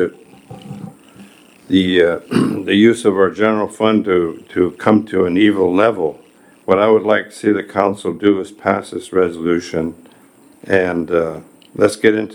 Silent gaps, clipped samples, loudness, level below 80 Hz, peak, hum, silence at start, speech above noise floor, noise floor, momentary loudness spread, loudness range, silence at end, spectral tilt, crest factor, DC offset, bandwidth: none; under 0.1%; -16 LUFS; -56 dBFS; 0 dBFS; none; 0 s; 32 dB; -47 dBFS; 10 LU; 4 LU; 0 s; -6 dB/octave; 16 dB; under 0.1%; 19 kHz